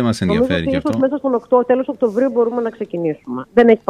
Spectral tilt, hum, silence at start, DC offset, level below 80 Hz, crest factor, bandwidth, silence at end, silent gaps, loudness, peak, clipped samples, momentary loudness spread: -7 dB/octave; none; 0 s; under 0.1%; -46 dBFS; 16 dB; 11.5 kHz; 0.1 s; none; -17 LUFS; 0 dBFS; under 0.1%; 8 LU